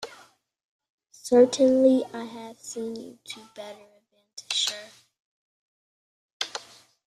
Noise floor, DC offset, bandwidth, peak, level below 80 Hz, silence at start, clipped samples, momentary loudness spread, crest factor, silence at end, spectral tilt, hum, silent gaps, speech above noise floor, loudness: -55 dBFS; under 0.1%; 13.5 kHz; -8 dBFS; -72 dBFS; 0 s; under 0.1%; 23 LU; 20 dB; 0.5 s; -3 dB/octave; none; 0.64-0.79 s, 0.89-0.98 s, 5.20-6.40 s; 30 dB; -23 LUFS